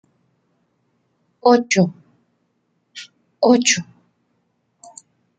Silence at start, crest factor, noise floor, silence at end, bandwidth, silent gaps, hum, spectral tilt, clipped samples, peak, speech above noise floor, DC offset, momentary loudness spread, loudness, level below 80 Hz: 1.45 s; 22 dB; -68 dBFS; 1.55 s; 9.4 kHz; none; none; -4 dB/octave; under 0.1%; 0 dBFS; 53 dB; under 0.1%; 25 LU; -17 LUFS; -68 dBFS